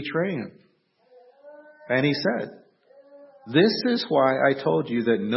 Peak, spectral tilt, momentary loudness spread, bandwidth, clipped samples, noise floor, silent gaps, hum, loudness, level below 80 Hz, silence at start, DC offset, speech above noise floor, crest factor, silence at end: -6 dBFS; -9 dB/octave; 11 LU; 5.8 kHz; under 0.1%; -59 dBFS; none; none; -23 LUFS; -72 dBFS; 0 s; under 0.1%; 36 dB; 20 dB; 0 s